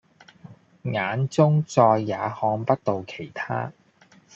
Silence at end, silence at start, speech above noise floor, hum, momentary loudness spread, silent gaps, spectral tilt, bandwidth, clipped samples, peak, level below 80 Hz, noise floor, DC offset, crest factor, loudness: 0.65 s; 0.5 s; 33 dB; none; 14 LU; none; -6.5 dB/octave; 8 kHz; under 0.1%; -4 dBFS; -66 dBFS; -56 dBFS; under 0.1%; 20 dB; -23 LUFS